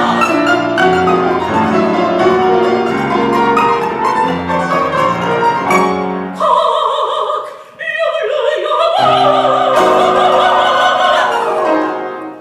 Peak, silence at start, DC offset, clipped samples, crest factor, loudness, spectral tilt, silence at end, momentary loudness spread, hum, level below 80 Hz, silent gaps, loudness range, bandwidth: -2 dBFS; 0 s; 0.1%; under 0.1%; 12 dB; -12 LUFS; -5 dB/octave; 0 s; 6 LU; none; -48 dBFS; none; 4 LU; 14.5 kHz